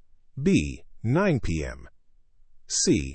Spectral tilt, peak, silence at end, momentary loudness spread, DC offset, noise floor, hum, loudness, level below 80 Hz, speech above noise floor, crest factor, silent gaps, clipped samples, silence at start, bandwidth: -5 dB/octave; -10 dBFS; 0 s; 14 LU; under 0.1%; -54 dBFS; none; -25 LUFS; -42 dBFS; 30 dB; 16 dB; none; under 0.1%; 0.35 s; 8.8 kHz